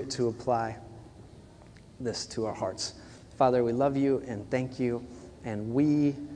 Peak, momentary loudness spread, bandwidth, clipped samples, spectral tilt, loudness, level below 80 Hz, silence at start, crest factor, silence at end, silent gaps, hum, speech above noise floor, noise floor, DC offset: -10 dBFS; 19 LU; 10 kHz; under 0.1%; -6 dB/octave; -30 LUFS; -58 dBFS; 0 s; 20 dB; 0 s; none; none; 23 dB; -52 dBFS; under 0.1%